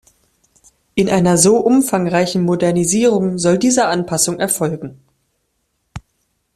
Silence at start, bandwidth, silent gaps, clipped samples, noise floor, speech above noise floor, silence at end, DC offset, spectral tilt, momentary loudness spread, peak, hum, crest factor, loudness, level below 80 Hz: 0.95 s; 15 kHz; none; under 0.1%; -68 dBFS; 54 dB; 0.55 s; under 0.1%; -4.5 dB/octave; 8 LU; 0 dBFS; none; 16 dB; -15 LUFS; -50 dBFS